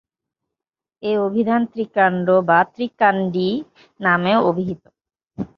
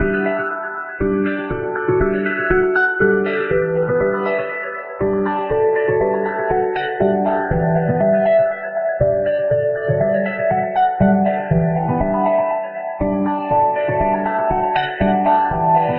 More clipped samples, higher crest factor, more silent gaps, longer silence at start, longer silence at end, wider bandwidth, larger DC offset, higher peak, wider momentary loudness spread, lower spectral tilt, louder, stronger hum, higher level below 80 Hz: neither; about the same, 18 dB vs 16 dB; neither; first, 1.05 s vs 0 s; about the same, 0.1 s vs 0 s; first, 5.8 kHz vs 5.2 kHz; neither; about the same, -2 dBFS vs -2 dBFS; first, 12 LU vs 6 LU; first, -8.5 dB/octave vs -6 dB/octave; about the same, -19 LUFS vs -18 LUFS; neither; second, -60 dBFS vs -38 dBFS